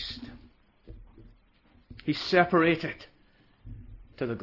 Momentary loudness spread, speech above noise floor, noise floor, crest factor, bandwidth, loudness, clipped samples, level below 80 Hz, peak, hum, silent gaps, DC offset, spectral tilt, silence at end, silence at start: 26 LU; 36 dB; -62 dBFS; 22 dB; 6 kHz; -27 LUFS; under 0.1%; -54 dBFS; -10 dBFS; none; none; under 0.1%; -6.5 dB/octave; 0 s; 0 s